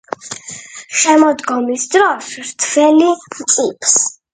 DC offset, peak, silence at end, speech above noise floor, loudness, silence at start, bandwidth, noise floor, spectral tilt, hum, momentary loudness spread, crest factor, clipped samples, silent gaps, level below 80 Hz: under 0.1%; 0 dBFS; 0.2 s; 19 dB; -13 LUFS; 0.25 s; 9.6 kHz; -33 dBFS; -1 dB/octave; none; 16 LU; 14 dB; under 0.1%; none; -64 dBFS